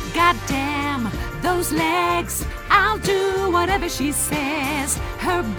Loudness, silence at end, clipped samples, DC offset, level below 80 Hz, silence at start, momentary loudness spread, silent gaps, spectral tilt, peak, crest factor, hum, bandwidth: -20 LUFS; 0 s; under 0.1%; under 0.1%; -34 dBFS; 0 s; 6 LU; none; -3.5 dB/octave; -2 dBFS; 18 dB; none; over 20 kHz